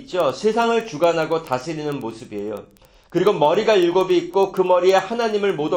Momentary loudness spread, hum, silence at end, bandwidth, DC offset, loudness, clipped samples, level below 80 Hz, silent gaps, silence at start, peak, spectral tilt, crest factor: 13 LU; none; 0 s; 16.5 kHz; under 0.1%; -19 LUFS; under 0.1%; -58 dBFS; none; 0 s; -4 dBFS; -5.5 dB/octave; 16 dB